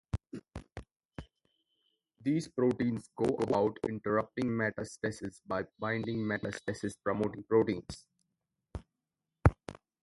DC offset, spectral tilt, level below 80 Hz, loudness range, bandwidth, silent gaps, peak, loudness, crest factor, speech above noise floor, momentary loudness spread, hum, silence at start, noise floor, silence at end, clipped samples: under 0.1%; -7 dB/octave; -48 dBFS; 3 LU; 11.5 kHz; 1.05-1.09 s; -4 dBFS; -33 LUFS; 30 dB; 55 dB; 19 LU; none; 0.15 s; -88 dBFS; 0.25 s; under 0.1%